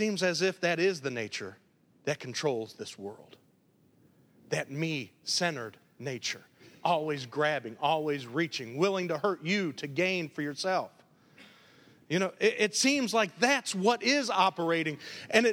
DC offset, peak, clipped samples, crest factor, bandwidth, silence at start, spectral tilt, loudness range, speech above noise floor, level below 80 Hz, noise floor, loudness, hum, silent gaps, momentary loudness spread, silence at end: under 0.1%; -8 dBFS; under 0.1%; 22 dB; over 20 kHz; 0 s; -3.5 dB/octave; 9 LU; 36 dB; -80 dBFS; -66 dBFS; -30 LUFS; none; none; 13 LU; 0 s